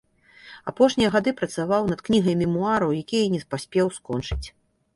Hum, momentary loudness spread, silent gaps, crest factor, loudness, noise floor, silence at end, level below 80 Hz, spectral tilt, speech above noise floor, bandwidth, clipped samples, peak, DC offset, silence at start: none; 12 LU; none; 18 dB; -23 LUFS; -50 dBFS; 0.45 s; -44 dBFS; -6 dB/octave; 27 dB; 11.5 kHz; under 0.1%; -6 dBFS; under 0.1%; 0.45 s